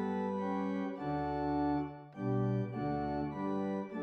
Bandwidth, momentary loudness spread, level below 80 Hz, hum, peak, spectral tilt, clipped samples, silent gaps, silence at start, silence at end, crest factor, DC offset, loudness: 6.2 kHz; 4 LU; -58 dBFS; none; -22 dBFS; -9.5 dB/octave; under 0.1%; none; 0 s; 0 s; 14 dB; under 0.1%; -36 LUFS